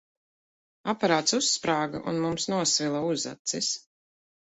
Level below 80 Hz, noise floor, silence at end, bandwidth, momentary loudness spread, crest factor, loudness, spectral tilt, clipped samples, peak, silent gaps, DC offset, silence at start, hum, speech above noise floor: -66 dBFS; under -90 dBFS; 0.7 s; 8.4 kHz; 7 LU; 20 dB; -26 LUFS; -3 dB/octave; under 0.1%; -8 dBFS; 3.39-3.45 s; under 0.1%; 0.85 s; none; over 63 dB